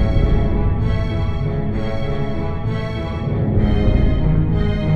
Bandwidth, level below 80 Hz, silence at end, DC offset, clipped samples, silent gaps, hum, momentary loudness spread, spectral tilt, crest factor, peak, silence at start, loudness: 6 kHz; -22 dBFS; 0 s; under 0.1%; under 0.1%; none; none; 6 LU; -9.5 dB/octave; 14 dB; -2 dBFS; 0 s; -20 LUFS